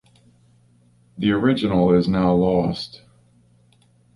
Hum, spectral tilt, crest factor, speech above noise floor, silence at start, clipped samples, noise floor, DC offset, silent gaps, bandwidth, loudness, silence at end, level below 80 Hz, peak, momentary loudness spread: none; -8.5 dB/octave; 18 dB; 39 dB; 1.15 s; under 0.1%; -57 dBFS; under 0.1%; none; 11 kHz; -19 LUFS; 1.3 s; -46 dBFS; -4 dBFS; 9 LU